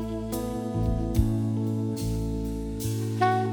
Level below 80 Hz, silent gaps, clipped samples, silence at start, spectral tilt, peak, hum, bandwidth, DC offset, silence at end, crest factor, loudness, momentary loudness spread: -34 dBFS; none; under 0.1%; 0 s; -7 dB/octave; -10 dBFS; none; over 20 kHz; under 0.1%; 0 s; 16 dB; -28 LUFS; 6 LU